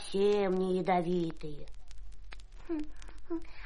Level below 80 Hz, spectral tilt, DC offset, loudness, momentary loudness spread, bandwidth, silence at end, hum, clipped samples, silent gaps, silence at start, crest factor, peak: -50 dBFS; -7 dB/octave; under 0.1%; -32 LUFS; 24 LU; 10.5 kHz; 0 s; none; under 0.1%; none; 0 s; 16 dB; -16 dBFS